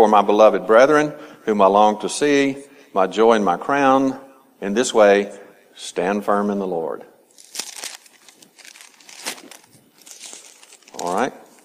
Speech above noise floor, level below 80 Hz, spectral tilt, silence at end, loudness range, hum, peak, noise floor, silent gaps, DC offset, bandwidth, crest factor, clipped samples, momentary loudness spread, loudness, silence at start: 35 dB; -64 dBFS; -4.5 dB/octave; 0.35 s; 18 LU; none; 0 dBFS; -51 dBFS; none; under 0.1%; 15.5 kHz; 18 dB; under 0.1%; 21 LU; -17 LUFS; 0 s